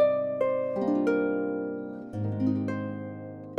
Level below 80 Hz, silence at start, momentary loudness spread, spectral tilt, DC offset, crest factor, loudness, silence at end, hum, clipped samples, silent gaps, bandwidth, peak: -68 dBFS; 0 s; 11 LU; -9.5 dB/octave; under 0.1%; 16 dB; -29 LUFS; 0 s; none; under 0.1%; none; 8.2 kHz; -14 dBFS